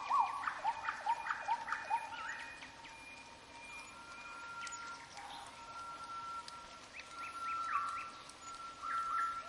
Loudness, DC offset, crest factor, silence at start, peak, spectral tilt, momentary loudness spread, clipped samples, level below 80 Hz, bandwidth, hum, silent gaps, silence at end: -42 LUFS; under 0.1%; 20 dB; 0 s; -22 dBFS; -1 dB/octave; 13 LU; under 0.1%; -74 dBFS; 11.5 kHz; none; none; 0 s